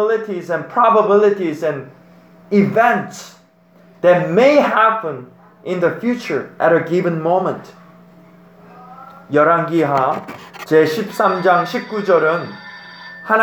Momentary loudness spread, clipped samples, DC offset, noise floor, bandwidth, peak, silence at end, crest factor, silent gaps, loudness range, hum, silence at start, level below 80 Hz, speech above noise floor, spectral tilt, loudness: 19 LU; under 0.1%; under 0.1%; -49 dBFS; 19.5 kHz; 0 dBFS; 0 s; 16 dB; none; 4 LU; none; 0 s; -66 dBFS; 34 dB; -6.5 dB/octave; -16 LUFS